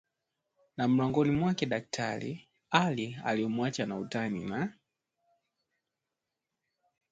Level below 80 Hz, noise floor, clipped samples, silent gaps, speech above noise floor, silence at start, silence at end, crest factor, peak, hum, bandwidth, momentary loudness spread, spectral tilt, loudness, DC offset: -66 dBFS; -88 dBFS; under 0.1%; none; 57 dB; 0.8 s; 2.4 s; 24 dB; -10 dBFS; none; 9.2 kHz; 10 LU; -6 dB/octave; -31 LUFS; under 0.1%